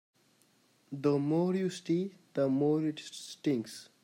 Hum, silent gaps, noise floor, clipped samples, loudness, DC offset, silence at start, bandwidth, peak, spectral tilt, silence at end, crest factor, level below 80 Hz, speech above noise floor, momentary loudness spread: none; none; -69 dBFS; under 0.1%; -32 LUFS; under 0.1%; 0.9 s; 16 kHz; -16 dBFS; -7 dB/octave; 0.2 s; 16 dB; -80 dBFS; 37 dB; 13 LU